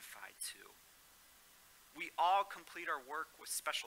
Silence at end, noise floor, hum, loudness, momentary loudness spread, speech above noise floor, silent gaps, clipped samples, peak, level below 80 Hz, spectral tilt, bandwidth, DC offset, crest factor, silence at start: 0 s; -64 dBFS; none; -40 LUFS; 27 LU; 25 dB; none; under 0.1%; -22 dBFS; -82 dBFS; 0.5 dB/octave; 16 kHz; under 0.1%; 20 dB; 0 s